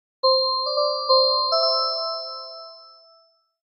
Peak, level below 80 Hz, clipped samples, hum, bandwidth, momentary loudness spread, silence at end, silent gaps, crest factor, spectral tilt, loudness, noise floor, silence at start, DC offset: -6 dBFS; under -90 dBFS; under 0.1%; none; 5.6 kHz; 18 LU; 0.85 s; none; 18 dB; 6.5 dB/octave; -20 LUFS; -60 dBFS; 0.25 s; under 0.1%